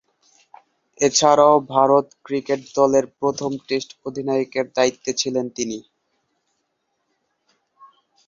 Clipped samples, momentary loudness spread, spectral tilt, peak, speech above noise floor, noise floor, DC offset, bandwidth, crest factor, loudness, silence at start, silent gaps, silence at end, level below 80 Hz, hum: under 0.1%; 13 LU; -3.5 dB/octave; -2 dBFS; 54 dB; -73 dBFS; under 0.1%; 7.6 kHz; 20 dB; -20 LUFS; 1 s; none; 2.45 s; -64 dBFS; none